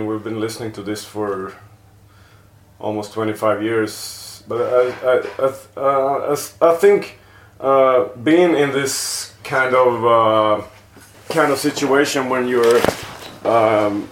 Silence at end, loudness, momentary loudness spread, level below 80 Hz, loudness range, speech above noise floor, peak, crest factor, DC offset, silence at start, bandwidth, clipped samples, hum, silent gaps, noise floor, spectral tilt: 0 s; -17 LUFS; 13 LU; -56 dBFS; 8 LU; 31 dB; 0 dBFS; 18 dB; under 0.1%; 0 s; 17 kHz; under 0.1%; none; none; -48 dBFS; -4.5 dB/octave